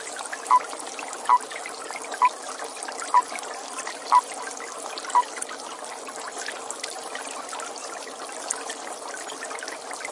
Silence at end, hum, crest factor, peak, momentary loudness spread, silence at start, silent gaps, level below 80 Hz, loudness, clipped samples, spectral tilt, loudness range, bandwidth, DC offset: 0 s; none; 24 dB; -6 dBFS; 12 LU; 0 s; none; -84 dBFS; -28 LUFS; under 0.1%; 0.5 dB/octave; 7 LU; 11.5 kHz; under 0.1%